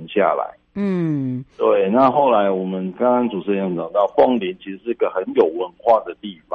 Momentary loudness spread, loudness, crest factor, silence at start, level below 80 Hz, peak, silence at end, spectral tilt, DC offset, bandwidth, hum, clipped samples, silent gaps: 11 LU; -19 LUFS; 16 dB; 0 s; -60 dBFS; -2 dBFS; 0 s; -9 dB/octave; under 0.1%; 6 kHz; none; under 0.1%; none